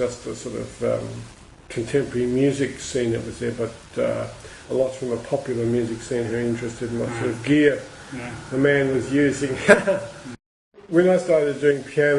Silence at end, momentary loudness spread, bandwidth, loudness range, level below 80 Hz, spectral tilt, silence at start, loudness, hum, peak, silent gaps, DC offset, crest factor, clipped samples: 0 s; 15 LU; 11.5 kHz; 5 LU; -50 dBFS; -6 dB/octave; 0 s; -22 LUFS; none; 0 dBFS; 10.46-10.71 s; under 0.1%; 22 dB; under 0.1%